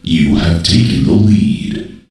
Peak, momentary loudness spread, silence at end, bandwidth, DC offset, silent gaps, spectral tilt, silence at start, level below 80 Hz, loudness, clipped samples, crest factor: 0 dBFS; 10 LU; 0.15 s; 11.5 kHz; under 0.1%; none; -6 dB/octave; 0.05 s; -28 dBFS; -11 LUFS; under 0.1%; 12 dB